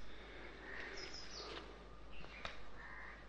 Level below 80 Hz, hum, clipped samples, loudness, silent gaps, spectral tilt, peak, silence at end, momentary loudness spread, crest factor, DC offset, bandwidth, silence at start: -60 dBFS; none; under 0.1%; -51 LUFS; none; -3 dB/octave; -28 dBFS; 0 s; 8 LU; 22 dB; under 0.1%; 9.6 kHz; 0 s